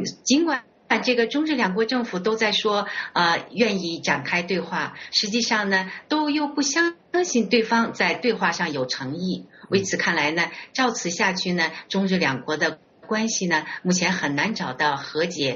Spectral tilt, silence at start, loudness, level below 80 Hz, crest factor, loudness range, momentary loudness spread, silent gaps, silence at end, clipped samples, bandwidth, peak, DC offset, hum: -2.5 dB/octave; 0 s; -23 LUFS; -64 dBFS; 18 dB; 2 LU; 5 LU; none; 0 s; under 0.1%; 7.4 kHz; -6 dBFS; under 0.1%; none